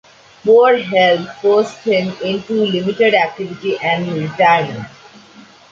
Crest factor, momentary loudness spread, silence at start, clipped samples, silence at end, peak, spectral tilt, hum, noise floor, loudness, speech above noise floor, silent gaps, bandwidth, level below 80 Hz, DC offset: 14 dB; 10 LU; 0.45 s; under 0.1%; 0.85 s; -2 dBFS; -6 dB/octave; none; -43 dBFS; -15 LUFS; 28 dB; none; 7.6 kHz; -60 dBFS; under 0.1%